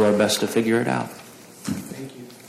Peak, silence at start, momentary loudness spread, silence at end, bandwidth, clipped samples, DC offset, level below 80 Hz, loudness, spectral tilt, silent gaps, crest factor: -8 dBFS; 0 s; 18 LU; 0 s; 15.5 kHz; under 0.1%; under 0.1%; -66 dBFS; -22 LUFS; -4.5 dB/octave; none; 16 dB